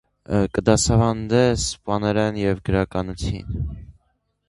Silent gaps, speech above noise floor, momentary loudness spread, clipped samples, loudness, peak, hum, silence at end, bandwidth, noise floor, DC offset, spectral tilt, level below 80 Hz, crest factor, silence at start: none; 48 dB; 11 LU; under 0.1%; -21 LUFS; 0 dBFS; none; 0.6 s; 11.5 kHz; -69 dBFS; under 0.1%; -5.5 dB/octave; -36 dBFS; 20 dB; 0.3 s